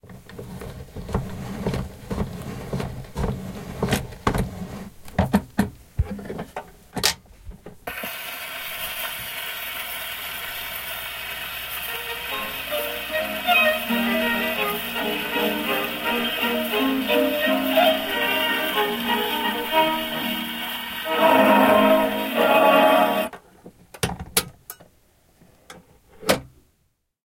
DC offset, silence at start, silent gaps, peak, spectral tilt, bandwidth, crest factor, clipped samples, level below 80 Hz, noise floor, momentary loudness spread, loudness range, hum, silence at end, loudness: under 0.1%; 0.05 s; none; -2 dBFS; -4 dB/octave; 16.5 kHz; 22 dB; under 0.1%; -42 dBFS; -69 dBFS; 17 LU; 11 LU; none; 0.8 s; -23 LUFS